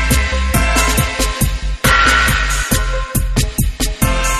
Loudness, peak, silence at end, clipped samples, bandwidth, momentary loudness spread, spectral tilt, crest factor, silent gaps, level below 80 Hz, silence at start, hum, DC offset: -15 LUFS; 0 dBFS; 0 s; under 0.1%; 14 kHz; 8 LU; -3.5 dB/octave; 14 dB; none; -18 dBFS; 0 s; none; under 0.1%